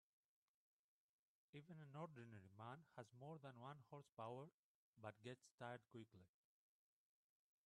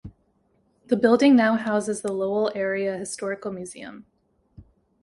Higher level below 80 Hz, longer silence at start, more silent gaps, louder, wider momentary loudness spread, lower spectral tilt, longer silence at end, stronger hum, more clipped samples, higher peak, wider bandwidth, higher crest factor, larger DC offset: second, under -90 dBFS vs -60 dBFS; first, 1.55 s vs 0.05 s; first, 4.12-4.17 s, 4.54-4.93 s, 5.51-5.58 s vs none; second, -60 LUFS vs -23 LUFS; second, 7 LU vs 18 LU; first, -6.5 dB/octave vs -5 dB/octave; first, 1.4 s vs 0.4 s; neither; neither; second, -40 dBFS vs -4 dBFS; about the same, 10.5 kHz vs 11.5 kHz; about the same, 22 dB vs 20 dB; neither